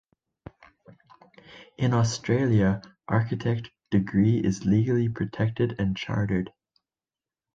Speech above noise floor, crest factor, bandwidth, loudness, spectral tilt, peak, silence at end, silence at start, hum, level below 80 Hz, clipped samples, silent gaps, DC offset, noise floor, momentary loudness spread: over 66 dB; 18 dB; 7.8 kHz; -26 LUFS; -7 dB/octave; -8 dBFS; 1.05 s; 0.9 s; none; -50 dBFS; under 0.1%; none; under 0.1%; under -90 dBFS; 7 LU